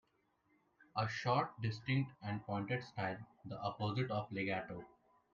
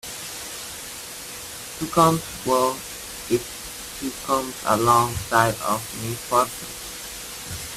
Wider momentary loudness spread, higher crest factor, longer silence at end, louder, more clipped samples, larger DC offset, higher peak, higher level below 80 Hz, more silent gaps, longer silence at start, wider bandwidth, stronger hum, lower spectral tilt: second, 9 LU vs 15 LU; about the same, 18 dB vs 22 dB; first, 0.45 s vs 0 s; second, -40 LUFS vs -24 LUFS; neither; neither; second, -22 dBFS vs -2 dBFS; second, -72 dBFS vs -50 dBFS; neither; first, 0.8 s vs 0.05 s; second, 7.2 kHz vs 16 kHz; neither; first, -7 dB/octave vs -3.5 dB/octave